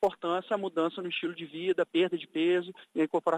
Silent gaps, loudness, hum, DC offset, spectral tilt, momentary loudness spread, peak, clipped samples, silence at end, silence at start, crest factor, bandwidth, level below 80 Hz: none; -31 LUFS; none; under 0.1%; -6 dB/octave; 6 LU; -14 dBFS; under 0.1%; 0 s; 0 s; 16 dB; 9 kHz; -76 dBFS